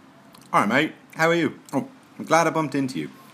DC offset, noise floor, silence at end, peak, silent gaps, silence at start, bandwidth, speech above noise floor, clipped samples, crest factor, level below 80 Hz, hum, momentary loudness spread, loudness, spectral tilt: under 0.1%; -49 dBFS; 0.25 s; -2 dBFS; none; 0.5 s; 15.5 kHz; 26 dB; under 0.1%; 22 dB; -74 dBFS; none; 11 LU; -23 LUFS; -5 dB/octave